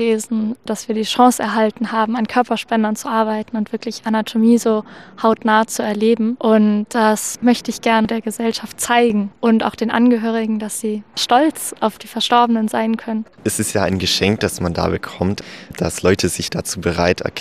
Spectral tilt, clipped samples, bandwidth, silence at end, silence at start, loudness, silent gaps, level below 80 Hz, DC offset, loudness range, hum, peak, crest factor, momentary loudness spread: -4.5 dB/octave; under 0.1%; 15.5 kHz; 0 s; 0 s; -17 LUFS; none; -52 dBFS; 0.2%; 3 LU; none; -2 dBFS; 16 dB; 8 LU